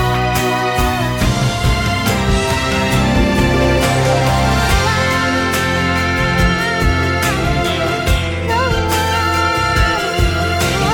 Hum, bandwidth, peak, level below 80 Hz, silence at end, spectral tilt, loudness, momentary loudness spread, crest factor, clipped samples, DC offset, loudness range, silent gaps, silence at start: none; 18 kHz; -2 dBFS; -22 dBFS; 0 s; -5 dB/octave; -15 LUFS; 2 LU; 12 dB; under 0.1%; under 0.1%; 1 LU; none; 0 s